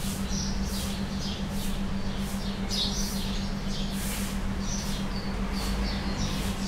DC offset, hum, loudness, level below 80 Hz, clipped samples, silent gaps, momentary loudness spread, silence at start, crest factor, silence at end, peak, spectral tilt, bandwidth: under 0.1%; none; -31 LUFS; -34 dBFS; under 0.1%; none; 4 LU; 0 s; 14 dB; 0 s; -16 dBFS; -4 dB/octave; 16 kHz